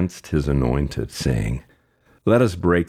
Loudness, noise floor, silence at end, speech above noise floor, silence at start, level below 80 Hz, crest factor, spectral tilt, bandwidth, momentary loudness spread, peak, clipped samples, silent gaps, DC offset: -21 LUFS; -59 dBFS; 0.05 s; 39 dB; 0 s; -32 dBFS; 16 dB; -7 dB/octave; 15.5 kHz; 9 LU; -4 dBFS; under 0.1%; none; under 0.1%